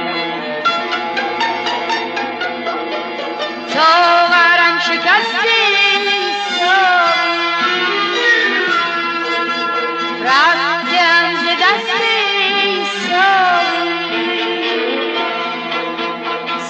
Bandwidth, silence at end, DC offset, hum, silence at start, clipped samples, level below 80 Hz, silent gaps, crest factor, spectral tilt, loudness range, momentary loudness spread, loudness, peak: 8.8 kHz; 0 s; under 0.1%; none; 0 s; under 0.1%; -80 dBFS; none; 12 dB; -2 dB/octave; 5 LU; 10 LU; -14 LUFS; -2 dBFS